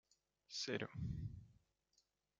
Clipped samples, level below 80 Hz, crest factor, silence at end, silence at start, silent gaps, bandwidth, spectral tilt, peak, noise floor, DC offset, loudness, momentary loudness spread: under 0.1%; -64 dBFS; 22 dB; 0.85 s; 0.5 s; none; 9.4 kHz; -4.5 dB/octave; -28 dBFS; -83 dBFS; under 0.1%; -47 LUFS; 9 LU